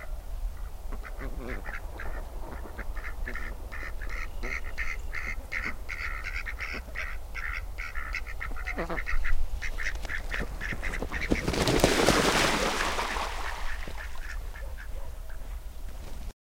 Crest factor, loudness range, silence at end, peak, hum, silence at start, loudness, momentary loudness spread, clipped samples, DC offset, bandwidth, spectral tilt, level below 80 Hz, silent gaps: 26 dB; 13 LU; 0.25 s; -4 dBFS; none; 0 s; -32 LUFS; 18 LU; under 0.1%; under 0.1%; 16.5 kHz; -3.5 dB/octave; -34 dBFS; none